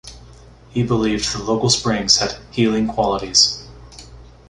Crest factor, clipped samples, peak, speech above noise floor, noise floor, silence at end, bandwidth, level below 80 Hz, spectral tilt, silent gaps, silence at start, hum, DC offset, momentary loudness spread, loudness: 20 dB; under 0.1%; 0 dBFS; 25 dB; -43 dBFS; 0.25 s; 11.5 kHz; -42 dBFS; -3.5 dB/octave; none; 0.05 s; none; under 0.1%; 9 LU; -17 LUFS